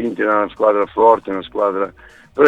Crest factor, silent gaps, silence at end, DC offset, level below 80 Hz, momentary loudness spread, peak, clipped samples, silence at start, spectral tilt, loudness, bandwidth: 16 dB; none; 0 s; under 0.1%; -52 dBFS; 11 LU; 0 dBFS; under 0.1%; 0 s; -7 dB/octave; -17 LUFS; 7.6 kHz